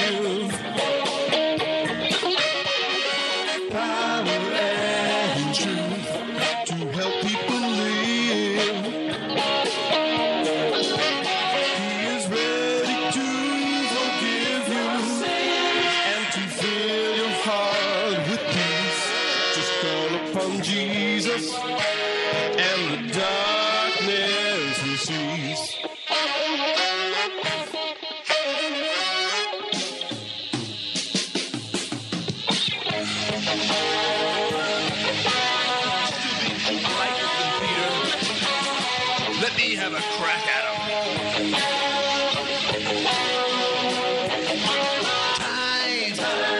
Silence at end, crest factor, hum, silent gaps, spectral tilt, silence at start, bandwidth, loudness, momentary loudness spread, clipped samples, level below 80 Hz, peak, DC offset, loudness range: 0 s; 14 dB; none; none; -3 dB/octave; 0 s; 11.5 kHz; -23 LUFS; 5 LU; under 0.1%; -64 dBFS; -10 dBFS; under 0.1%; 2 LU